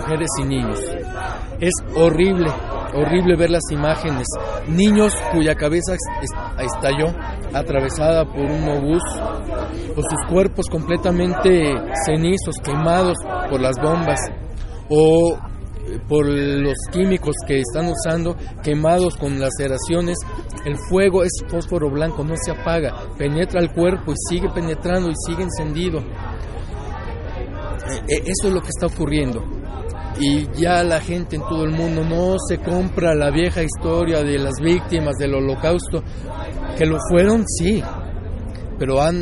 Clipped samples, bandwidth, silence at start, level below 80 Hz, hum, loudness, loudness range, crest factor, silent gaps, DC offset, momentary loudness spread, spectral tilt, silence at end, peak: under 0.1%; 11.5 kHz; 0 s; -30 dBFS; none; -20 LUFS; 4 LU; 16 dB; none; under 0.1%; 12 LU; -5.5 dB/octave; 0 s; -2 dBFS